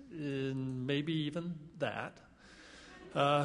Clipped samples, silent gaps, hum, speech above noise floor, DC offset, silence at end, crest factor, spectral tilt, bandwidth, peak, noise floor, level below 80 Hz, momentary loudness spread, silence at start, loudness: under 0.1%; none; none; 22 dB; under 0.1%; 0 s; 20 dB; -6.5 dB/octave; 10.5 kHz; -16 dBFS; -57 dBFS; -68 dBFS; 20 LU; 0 s; -37 LUFS